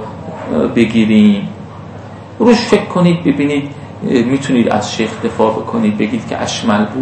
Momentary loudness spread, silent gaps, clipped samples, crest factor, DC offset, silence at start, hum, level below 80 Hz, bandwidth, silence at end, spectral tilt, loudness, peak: 17 LU; none; 0.2%; 14 dB; under 0.1%; 0 s; none; -46 dBFS; 8.8 kHz; 0 s; -6 dB/octave; -13 LUFS; 0 dBFS